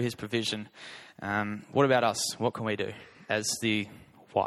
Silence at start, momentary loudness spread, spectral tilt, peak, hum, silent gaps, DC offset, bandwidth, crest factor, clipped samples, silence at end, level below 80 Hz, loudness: 0 s; 17 LU; -4 dB/octave; -10 dBFS; none; none; under 0.1%; 14.5 kHz; 22 dB; under 0.1%; 0 s; -68 dBFS; -30 LUFS